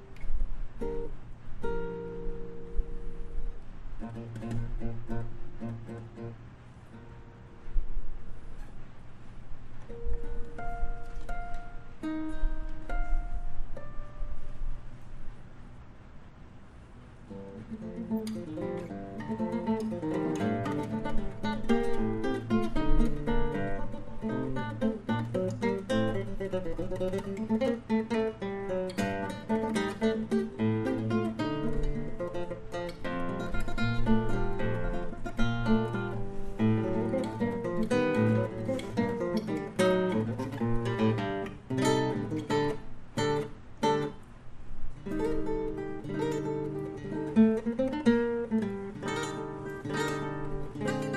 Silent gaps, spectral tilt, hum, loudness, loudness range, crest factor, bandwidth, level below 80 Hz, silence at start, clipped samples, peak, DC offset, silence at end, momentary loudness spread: none; -7 dB/octave; none; -33 LUFS; 14 LU; 20 dB; 11.5 kHz; -38 dBFS; 0 s; under 0.1%; -10 dBFS; under 0.1%; 0 s; 21 LU